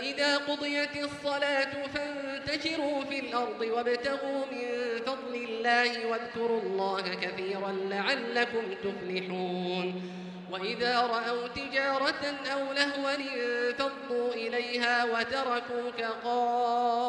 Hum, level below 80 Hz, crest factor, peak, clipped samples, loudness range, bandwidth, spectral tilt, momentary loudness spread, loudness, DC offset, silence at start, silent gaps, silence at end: none; -68 dBFS; 22 dB; -10 dBFS; under 0.1%; 2 LU; 10.5 kHz; -4 dB/octave; 7 LU; -31 LUFS; under 0.1%; 0 s; none; 0 s